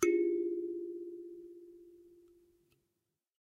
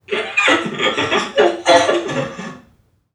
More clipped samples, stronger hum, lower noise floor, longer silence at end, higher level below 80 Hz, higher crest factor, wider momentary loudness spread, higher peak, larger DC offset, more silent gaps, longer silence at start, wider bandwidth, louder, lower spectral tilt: neither; neither; first, -87 dBFS vs -55 dBFS; first, 1.35 s vs 0.55 s; second, -78 dBFS vs -58 dBFS; about the same, 22 dB vs 18 dB; first, 25 LU vs 13 LU; second, -16 dBFS vs 0 dBFS; neither; neither; about the same, 0 s vs 0.1 s; first, 13 kHz vs 11.5 kHz; second, -37 LUFS vs -15 LUFS; about the same, -4 dB/octave vs -3 dB/octave